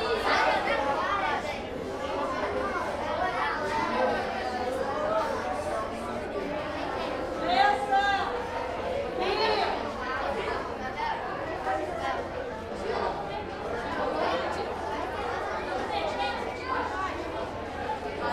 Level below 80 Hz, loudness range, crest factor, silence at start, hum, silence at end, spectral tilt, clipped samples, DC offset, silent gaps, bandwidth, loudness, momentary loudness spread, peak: -50 dBFS; 4 LU; 20 dB; 0 s; none; 0 s; -4.5 dB/octave; under 0.1%; under 0.1%; none; 14.5 kHz; -30 LUFS; 9 LU; -10 dBFS